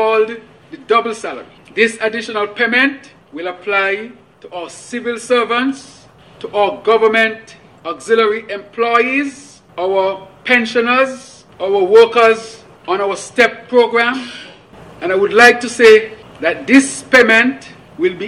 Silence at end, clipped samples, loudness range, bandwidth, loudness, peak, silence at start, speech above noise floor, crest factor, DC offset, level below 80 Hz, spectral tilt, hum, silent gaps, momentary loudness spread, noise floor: 0 s; under 0.1%; 7 LU; 12.5 kHz; -13 LUFS; 0 dBFS; 0 s; 25 dB; 14 dB; under 0.1%; -56 dBFS; -3 dB/octave; none; none; 21 LU; -39 dBFS